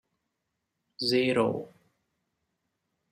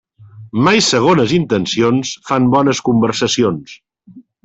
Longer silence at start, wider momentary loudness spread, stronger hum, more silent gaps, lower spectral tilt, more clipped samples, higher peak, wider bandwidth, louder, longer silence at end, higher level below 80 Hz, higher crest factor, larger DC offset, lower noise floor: first, 1 s vs 0.2 s; first, 14 LU vs 7 LU; neither; neither; about the same, -5 dB/octave vs -4.5 dB/octave; neither; second, -12 dBFS vs -2 dBFS; first, 15.5 kHz vs 8.4 kHz; second, -28 LUFS vs -14 LUFS; first, 1.45 s vs 0.25 s; second, -72 dBFS vs -50 dBFS; first, 20 dB vs 14 dB; neither; first, -82 dBFS vs -43 dBFS